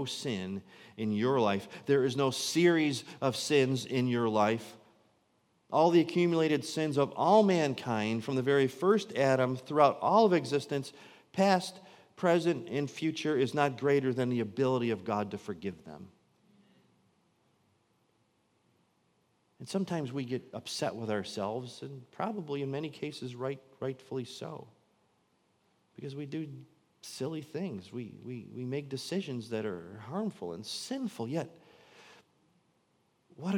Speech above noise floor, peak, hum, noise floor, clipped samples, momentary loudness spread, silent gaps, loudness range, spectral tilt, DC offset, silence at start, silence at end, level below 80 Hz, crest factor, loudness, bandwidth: 42 dB; -10 dBFS; none; -73 dBFS; under 0.1%; 17 LU; none; 14 LU; -5.5 dB/octave; under 0.1%; 0 s; 0 s; -80 dBFS; 22 dB; -31 LUFS; 16.5 kHz